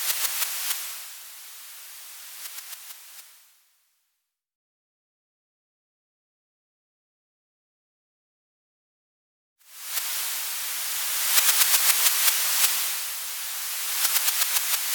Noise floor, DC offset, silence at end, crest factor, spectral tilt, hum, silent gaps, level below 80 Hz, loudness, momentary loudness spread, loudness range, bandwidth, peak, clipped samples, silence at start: -79 dBFS; under 0.1%; 0 s; 26 dB; 5.5 dB/octave; none; 4.55-9.56 s; under -90 dBFS; -22 LUFS; 22 LU; 21 LU; 19.5 kHz; -2 dBFS; under 0.1%; 0 s